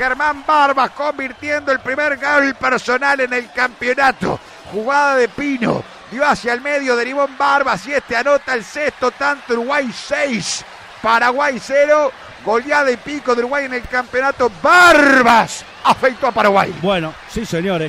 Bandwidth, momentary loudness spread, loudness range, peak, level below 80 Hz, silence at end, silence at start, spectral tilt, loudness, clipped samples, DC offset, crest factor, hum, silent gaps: 16 kHz; 9 LU; 5 LU; 0 dBFS; -46 dBFS; 0 s; 0 s; -4 dB/octave; -15 LUFS; under 0.1%; under 0.1%; 16 dB; none; none